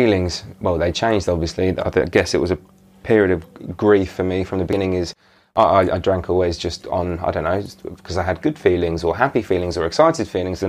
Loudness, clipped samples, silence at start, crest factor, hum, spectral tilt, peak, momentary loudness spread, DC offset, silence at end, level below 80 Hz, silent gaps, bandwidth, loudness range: -19 LUFS; under 0.1%; 0 s; 18 dB; none; -6 dB/octave; -2 dBFS; 8 LU; under 0.1%; 0 s; -40 dBFS; none; 14.5 kHz; 2 LU